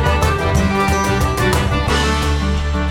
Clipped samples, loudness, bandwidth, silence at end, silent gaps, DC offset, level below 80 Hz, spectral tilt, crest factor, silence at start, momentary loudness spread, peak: under 0.1%; -16 LUFS; 17 kHz; 0 s; none; under 0.1%; -20 dBFS; -5 dB/octave; 12 dB; 0 s; 3 LU; -4 dBFS